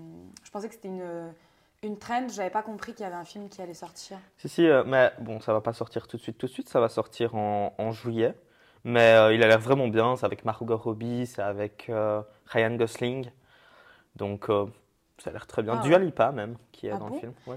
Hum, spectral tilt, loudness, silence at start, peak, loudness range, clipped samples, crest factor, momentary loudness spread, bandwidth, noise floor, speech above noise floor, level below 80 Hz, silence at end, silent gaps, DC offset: none; -6 dB/octave; -26 LUFS; 0 s; -8 dBFS; 12 LU; under 0.1%; 20 dB; 20 LU; 14.5 kHz; -57 dBFS; 30 dB; -68 dBFS; 0 s; none; under 0.1%